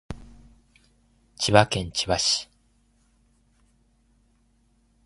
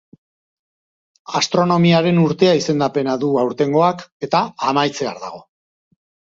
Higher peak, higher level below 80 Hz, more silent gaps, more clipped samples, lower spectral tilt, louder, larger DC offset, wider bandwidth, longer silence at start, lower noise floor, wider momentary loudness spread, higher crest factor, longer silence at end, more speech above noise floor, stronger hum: about the same, 0 dBFS vs -2 dBFS; first, -50 dBFS vs -60 dBFS; second, none vs 4.12-4.20 s; neither; second, -3.5 dB/octave vs -5.5 dB/octave; second, -22 LUFS vs -17 LUFS; neither; first, 11.5 kHz vs 7.6 kHz; second, 0.1 s vs 1.3 s; second, -64 dBFS vs under -90 dBFS; first, 23 LU vs 11 LU; first, 28 dB vs 18 dB; first, 2.6 s vs 0.9 s; second, 42 dB vs over 73 dB; neither